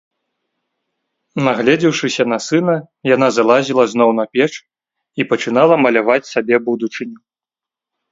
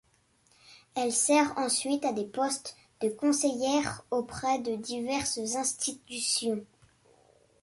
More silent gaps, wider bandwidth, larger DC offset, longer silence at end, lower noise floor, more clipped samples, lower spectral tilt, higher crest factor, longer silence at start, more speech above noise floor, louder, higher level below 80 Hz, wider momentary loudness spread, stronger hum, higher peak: neither; second, 7.8 kHz vs 12 kHz; neither; about the same, 0.95 s vs 0.95 s; first, -88 dBFS vs -67 dBFS; neither; first, -5 dB/octave vs -2.5 dB/octave; about the same, 16 dB vs 20 dB; first, 1.35 s vs 0.7 s; first, 74 dB vs 38 dB; first, -15 LUFS vs -29 LUFS; about the same, -64 dBFS vs -66 dBFS; about the same, 11 LU vs 9 LU; neither; first, 0 dBFS vs -12 dBFS